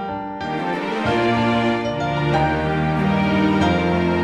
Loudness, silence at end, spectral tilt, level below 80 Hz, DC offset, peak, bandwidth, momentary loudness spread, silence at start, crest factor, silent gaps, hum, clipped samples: -20 LUFS; 0 s; -7 dB/octave; -40 dBFS; under 0.1%; -4 dBFS; 10.5 kHz; 6 LU; 0 s; 16 dB; none; none; under 0.1%